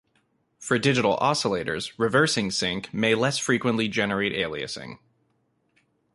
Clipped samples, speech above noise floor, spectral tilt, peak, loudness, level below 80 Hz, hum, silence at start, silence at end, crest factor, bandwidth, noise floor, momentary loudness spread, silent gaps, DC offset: under 0.1%; 46 dB; -4 dB/octave; -8 dBFS; -24 LUFS; -58 dBFS; none; 0.6 s; 1.2 s; 18 dB; 11.5 kHz; -70 dBFS; 10 LU; none; under 0.1%